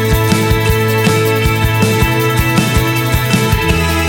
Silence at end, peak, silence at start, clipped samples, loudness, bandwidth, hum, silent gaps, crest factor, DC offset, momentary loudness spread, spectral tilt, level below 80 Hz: 0 s; 0 dBFS; 0 s; under 0.1%; -12 LUFS; 17 kHz; none; none; 12 dB; under 0.1%; 1 LU; -5 dB/octave; -22 dBFS